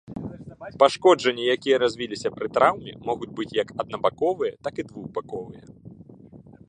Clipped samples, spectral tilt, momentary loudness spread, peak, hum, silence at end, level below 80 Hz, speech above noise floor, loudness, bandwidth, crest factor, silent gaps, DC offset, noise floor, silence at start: under 0.1%; -4.5 dB/octave; 18 LU; -2 dBFS; none; 0.25 s; -60 dBFS; 24 dB; -24 LUFS; 9.8 kHz; 22 dB; none; under 0.1%; -47 dBFS; 0.1 s